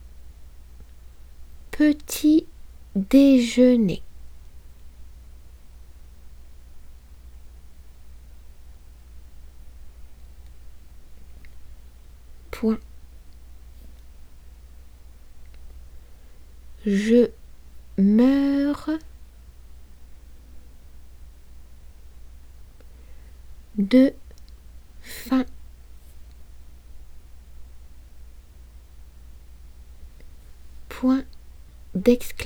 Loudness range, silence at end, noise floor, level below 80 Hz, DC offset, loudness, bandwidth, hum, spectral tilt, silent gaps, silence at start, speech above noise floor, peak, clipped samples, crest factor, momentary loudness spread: 14 LU; 0 s; -45 dBFS; -44 dBFS; under 0.1%; -21 LUFS; 18 kHz; none; -6.5 dB/octave; none; 0.05 s; 27 dB; -4 dBFS; under 0.1%; 22 dB; 21 LU